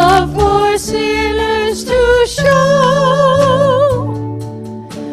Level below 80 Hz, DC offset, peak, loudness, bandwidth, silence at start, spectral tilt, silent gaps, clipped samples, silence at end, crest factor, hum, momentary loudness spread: -30 dBFS; under 0.1%; 0 dBFS; -12 LUFS; 14 kHz; 0 s; -5 dB/octave; none; under 0.1%; 0 s; 12 dB; none; 13 LU